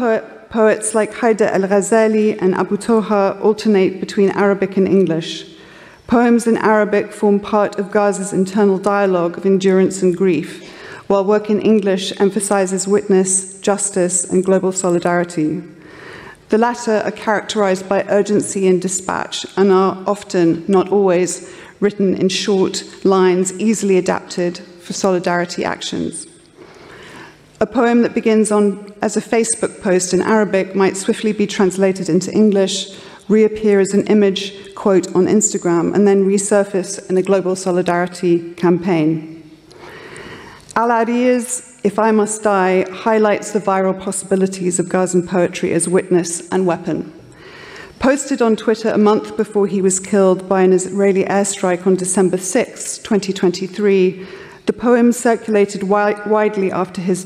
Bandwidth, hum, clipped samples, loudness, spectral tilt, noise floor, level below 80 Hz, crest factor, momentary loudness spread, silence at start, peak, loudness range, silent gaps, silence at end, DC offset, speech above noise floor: 14 kHz; none; under 0.1%; -16 LUFS; -5 dB/octave; -42 dBFS; -56 dBFS; 12 dB; 9 LU; 0 s; -2 dBFS; 3 LU; none; 0 s; under 0.1%; 27 dB